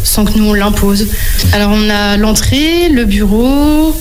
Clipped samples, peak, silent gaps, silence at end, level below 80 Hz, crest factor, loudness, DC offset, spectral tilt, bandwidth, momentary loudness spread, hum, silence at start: under 0.1%; 0 dBFS; none; 0 s; -16 dBFS; 8 dB; -10 LUFS; under 0.1%; -4.5 dB/octave; 18 kHz; 2 LU; none; 0 s